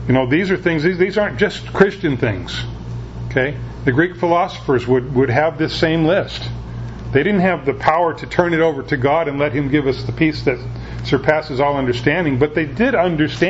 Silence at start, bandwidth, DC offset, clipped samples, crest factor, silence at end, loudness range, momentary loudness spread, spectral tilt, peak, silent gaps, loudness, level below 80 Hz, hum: 0 s; 8 kHz; under 0.1%; under 0.1%; 18 dB; 0 s; 2 LU; 10 LU; -7 dB/octave; 0 dBFS; none; -17 LUFS; -36 dBFS; none